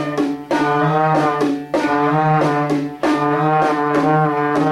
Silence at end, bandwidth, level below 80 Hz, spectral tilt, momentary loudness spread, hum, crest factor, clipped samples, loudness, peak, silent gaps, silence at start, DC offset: 0 s; 12.5 kHz; -56 dBFS; -7 dB/octave; 4 LU; none; 14 dB; under 0.1%; -17 LUFS; -4 dBFS; none; 0 s; under 0.1%